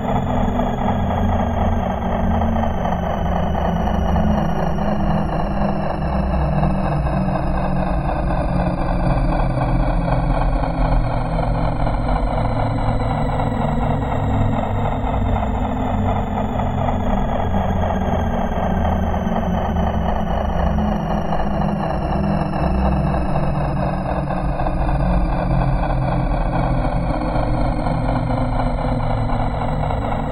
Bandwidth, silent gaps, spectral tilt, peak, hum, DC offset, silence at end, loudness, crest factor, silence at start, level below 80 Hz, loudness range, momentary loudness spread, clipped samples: 9.2 kHz; none; -8.5 dB/octave; -4 dBFS; none; under 0.1%; 0 s; -20 LUFS; 14 dB; 0 s; -22 dBFS; 1 LU; 2 LU; under 0.1%